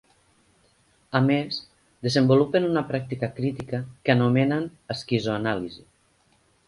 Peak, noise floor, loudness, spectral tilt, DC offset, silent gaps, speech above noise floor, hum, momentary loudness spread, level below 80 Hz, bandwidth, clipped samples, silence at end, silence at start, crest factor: -6 dBFS; -64 dBFS; -24 LUFS; -7 dB/octave; under 0.1%; none; 40 dB; none; 12 LU; -60 dBFS; 11.5 kHz; under 0.1%; 0.9 s; 1.1 s; 20 dB